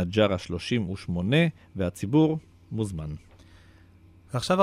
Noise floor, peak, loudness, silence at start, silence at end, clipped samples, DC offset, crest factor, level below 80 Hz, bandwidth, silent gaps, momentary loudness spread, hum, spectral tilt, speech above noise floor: -54 dBFS; -8 dBFS; -27 LUFS; 0 s; 0 s; under 0.1%; under 0.1%; 20 dB; -50 dBFS; 14.5 kHz; none; 13 LU; none; -6.5 dB/octave; 28 dB